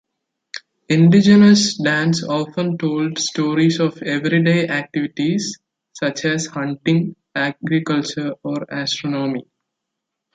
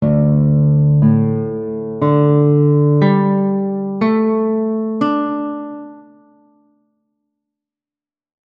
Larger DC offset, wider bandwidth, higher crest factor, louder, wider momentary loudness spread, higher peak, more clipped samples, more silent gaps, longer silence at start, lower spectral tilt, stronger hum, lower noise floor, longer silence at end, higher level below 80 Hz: neither; first, 9.2 kHz vs 4.7 kHz; about the same, 16 dB vs 14 dB; second, -18 LUFS vs -15 LUFS; about the same, 13 LU vs 11 LU; about the same, -2 dBFS vs 0 dBFS; neither; neither; first, 0.55 s vs 0 s; second, -5.5 dB/octave vs -11.5 dB/octave; neither; second, -80 dBFS vs under -90 dBFS; second, 0.95 s vs 2.5 s; second, -60 dBFS vs -46 dBFS